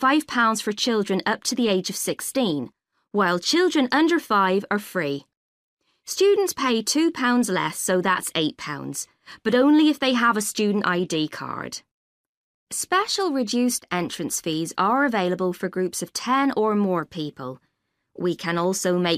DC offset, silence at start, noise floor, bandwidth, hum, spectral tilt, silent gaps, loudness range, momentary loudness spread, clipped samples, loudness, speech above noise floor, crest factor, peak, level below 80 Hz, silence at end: under 0.1%; 0 s; -62 dBFS; 15.5 kHz; none; -3.5 dB/octave; 5.37-5.77 s, 11.91-12.67 s; 4 LU; 12 LU; under 0.1%; -23 LUFS; 40 dB; 14 dB; -8 dBFS; -68 dBFS; 0 s